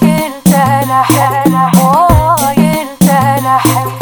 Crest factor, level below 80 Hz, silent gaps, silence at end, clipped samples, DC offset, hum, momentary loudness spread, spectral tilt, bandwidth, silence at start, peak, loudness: 8 dB; -26 dBFS; none; 0 s; 0.3%; under 0.1%; none; 3 LU; -5.5 dB/octave; over 20 kHz; 0 s; 0 dBFS; -9 LUFS